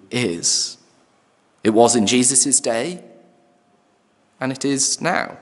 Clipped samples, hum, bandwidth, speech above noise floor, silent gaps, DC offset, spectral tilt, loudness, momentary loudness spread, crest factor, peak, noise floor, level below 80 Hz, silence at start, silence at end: under 0.1%; none; 12 kHz; 42 dB; none; under 0.1%; -2.5 dB/octave; -17 LUFS; 13 LU; 20 dB; 0 dBFS; -60 dBFS; -68 dBFS; 0.1 s; 0.05 s